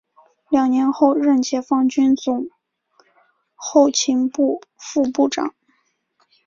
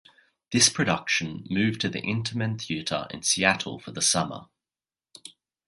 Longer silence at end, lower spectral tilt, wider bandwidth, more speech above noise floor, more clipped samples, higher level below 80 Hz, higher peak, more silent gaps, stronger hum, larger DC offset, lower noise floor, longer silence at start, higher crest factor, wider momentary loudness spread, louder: first, 0.95 s vs 0.35 s; about the same, -3 dB/octave vs -2.5 dB/octave; second, 7.6 kHz vs 11.5 kHz; second, 49 dB vs over 64 dB; neither; second, -64 dBFS vs -58 dBFS; about the same, -2 dBFS vs -2 dBFS; neither; neither; neither; second, -66 dBFS vs under -90 dBFS; about the same, 0.5 s vs 0.5 s; second, 18 dB vs 26 dB; second, 10 LU vs 14 LU; first, -18 LUFS vs -25 LUFS